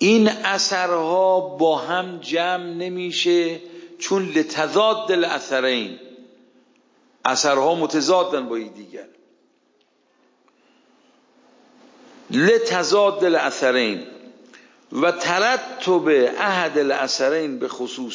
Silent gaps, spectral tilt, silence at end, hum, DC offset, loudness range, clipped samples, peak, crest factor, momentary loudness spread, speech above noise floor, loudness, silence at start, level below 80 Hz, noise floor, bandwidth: none; -3.5 dB/octave; 0 s; none; under 0.1%; 5 LU; under 0.1%; -2 dBFS; 20 dB; 12 LU; 43 dB; -20 LUFS; 0 s; -76 dBFS; -63 dBFS; 7.6 kHz